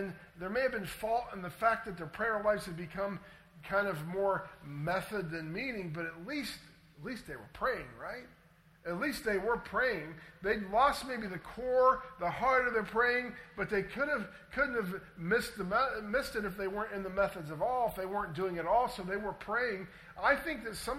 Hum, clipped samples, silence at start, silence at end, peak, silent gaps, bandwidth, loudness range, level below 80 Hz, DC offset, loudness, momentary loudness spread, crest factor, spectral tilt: none; under 0.1%; 0 s; 0 s; -14 dBFS; none; 16 kHz; 7 LU; -58 dBFS; under 0.1%; -34 LUFS; 13 LU; 20 dB; -5 dB/octave